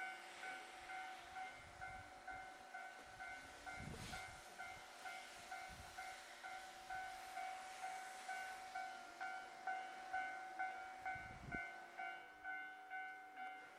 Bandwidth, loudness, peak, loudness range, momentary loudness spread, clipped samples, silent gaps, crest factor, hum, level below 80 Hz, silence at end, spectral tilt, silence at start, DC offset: 16 kHz; -51 LUFS; -32 dBFS; 4 LU; 6 LU; under 0.1%; none; 20 dB; none; -72 dBFS; 0 s; -2.5 dB/octave; 0 s; under 0.1%